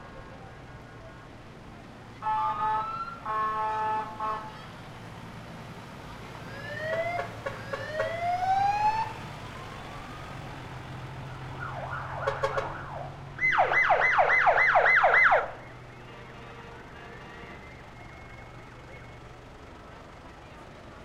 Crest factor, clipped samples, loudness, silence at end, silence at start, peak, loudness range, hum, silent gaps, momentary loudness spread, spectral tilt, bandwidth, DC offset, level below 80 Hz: 20 dB; under 0.1%; -26 LUFS; 0 s; 0 s; -10 dBFS; 22 LU; none; none; 25 LU; -5 dB/octave; 14.5 kHz; under 0.1%; -54 dBFS